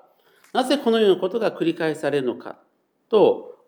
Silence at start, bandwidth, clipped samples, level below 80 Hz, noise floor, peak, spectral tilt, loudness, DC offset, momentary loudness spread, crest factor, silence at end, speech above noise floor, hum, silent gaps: 0.55 s; 18 kHz; under 0.1%; -86 dBFS; -57 dBFS; -6 dBFS; -5.5 dB/octave; -21 LUFS; under 0.1%; 10 LU; 16 dB; 0.15 s; 37 dB; none; none